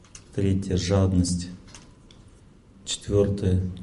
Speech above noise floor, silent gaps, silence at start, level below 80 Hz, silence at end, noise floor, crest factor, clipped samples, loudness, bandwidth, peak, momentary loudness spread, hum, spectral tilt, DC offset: 29 dB; none; 0.15 s; -38 dBFS; 0 s; -52 dBFS; 18 dB; under 0.1%; -25 LUFS; 11.5 kHz; -8 dBFS; 15 LU; none; -6 dB/octave; under 0.1%